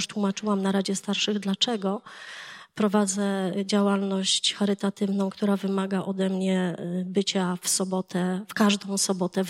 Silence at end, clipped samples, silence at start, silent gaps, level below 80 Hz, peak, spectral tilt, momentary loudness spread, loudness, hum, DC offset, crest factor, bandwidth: 0 s; under 0.1%; 0 s; none; -76 dBFS; -8 dBFS; -4 dB/octave; 6 LU; -26 LUFS; none; under 0.1%; 18 dB; 15.5 kHz